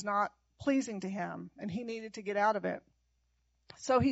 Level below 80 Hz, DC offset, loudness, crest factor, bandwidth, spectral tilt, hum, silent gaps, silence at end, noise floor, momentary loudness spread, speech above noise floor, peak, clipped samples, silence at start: -66 dBFS; under 0.1%; -35 LUFS; 18 dB; 8 kHz; -5 dB/octave; none; none; 0 s; -76 dBFS; 11 LU; 43 dB; -16 dBFS; under 0.1%; 0 s